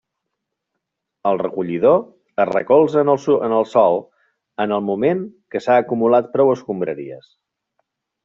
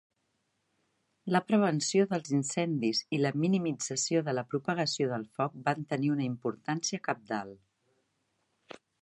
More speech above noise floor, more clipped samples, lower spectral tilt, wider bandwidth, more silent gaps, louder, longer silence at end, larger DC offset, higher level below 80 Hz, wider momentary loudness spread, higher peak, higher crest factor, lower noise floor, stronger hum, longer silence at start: first, 62 dB vs 48 dB; neither; first, -7.5 dB/octave vs -4.5 dB/octave; second, 7.6 kHz vs 11.5 kHz; neither; first, -18 LUFS vs -31 LUFS; second, 1.05 s vs 1.45 s; neither; first, -64 dBFS vs -78 dBFS; about the same, 10 LU vs 8 LU; first, -2 dBFS vs -12 dBFS; about the same, 16 dB vs 20 dB; about the same, -79 dBFS vs -78 dBFS; neither; about the same, 1.25 s vs 1.25 s